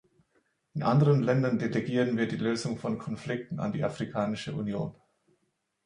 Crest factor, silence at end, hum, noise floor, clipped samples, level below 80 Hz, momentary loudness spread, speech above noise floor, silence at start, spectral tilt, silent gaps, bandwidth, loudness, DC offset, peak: 18 dB; 0.95 s; none; -77 dBFS; under 0.1%; -64 dBFS; 11 LU; 49 dB; 0.75 s; -7.5 dB/octave; none; 10.5 kHz; -29 LUFS; under 0.1%; -12 dBFS